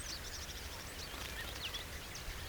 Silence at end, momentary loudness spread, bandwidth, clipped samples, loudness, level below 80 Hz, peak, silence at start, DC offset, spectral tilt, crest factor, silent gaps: 0 s; 3 LU; over 20 kHz; under 0.1%; -44 LUFS; -52 dBFS; -28 dBFS; 0 s; under 0.1%; -2 dB/octave; 18 dB; none